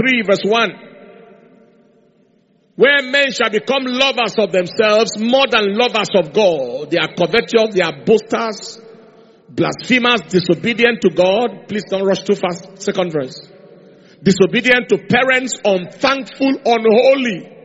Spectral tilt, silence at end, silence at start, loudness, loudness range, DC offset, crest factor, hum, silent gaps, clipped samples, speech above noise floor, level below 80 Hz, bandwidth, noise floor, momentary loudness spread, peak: -2.5 dB/octave; 0.1 s; 0 s; -15 LUFS; 4 LU; under 0.1%; 16 dB; none; none; under 0.1%; 41 dB; -58 dBFS; 8 kHz; -56 dBFS; 8 LU; 0 dBFS